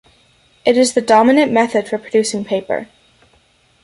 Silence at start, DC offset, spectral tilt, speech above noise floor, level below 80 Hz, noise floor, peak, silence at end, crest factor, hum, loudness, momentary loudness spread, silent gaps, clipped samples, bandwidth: 0.65 s; under 0.1%; -4 dB/octave; 41 dB; -60 dBFS; -55 dBFS; -2 dBFS; 1 s; 14 dB; none; -15 LUFS; 10 LU; none; under 0.1%; 11.5 kHz